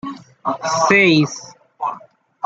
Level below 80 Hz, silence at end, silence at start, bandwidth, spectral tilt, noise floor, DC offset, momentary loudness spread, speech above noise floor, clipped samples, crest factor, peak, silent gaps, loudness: -62 dBFS; 0.5 s; 0.05 s; 8 kHz; -4.5 dB/octave; -43 dBFS; under 0.1%; 21 LU; 27 dB; under 0.1%; 18 dB; 0 dBFS; none; -17 LUFS